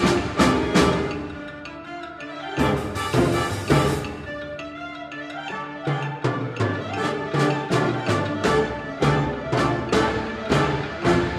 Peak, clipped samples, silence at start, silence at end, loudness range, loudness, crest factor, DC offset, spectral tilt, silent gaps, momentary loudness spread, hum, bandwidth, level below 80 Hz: -4 dBFS; under 0.1%; 0 s; 0 s; 4 LU; -23 LUFS; 20 dB; under 0.1%; -5.5 dB/octave; none; 14 LU; none; 14.5 kHz; -40 dBFS